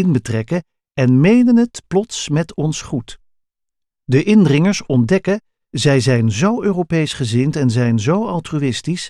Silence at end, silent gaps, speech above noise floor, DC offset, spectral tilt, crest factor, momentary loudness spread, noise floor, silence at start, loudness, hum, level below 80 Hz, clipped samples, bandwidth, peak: 0 s; none; 67 dB; under 0.1%; -6.5 dB/octave; 14 dB; 10 LU; -82 dBFS; 0 s; -16 LUFS; none; -48 dBFS; under 0.1%; 11.5 kHz; -2 dBFS